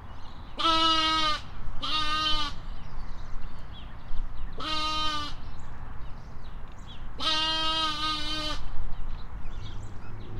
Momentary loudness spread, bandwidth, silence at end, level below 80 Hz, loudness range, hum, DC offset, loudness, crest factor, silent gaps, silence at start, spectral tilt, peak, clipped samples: 21 LU; 10 kHz; 0 s; -36 dBFS; 7 LU; none; under 0.1%; -27 LUFS; 16 dB; none; 0 s; -3 dB/octave; -12 dBFS; under 0.1%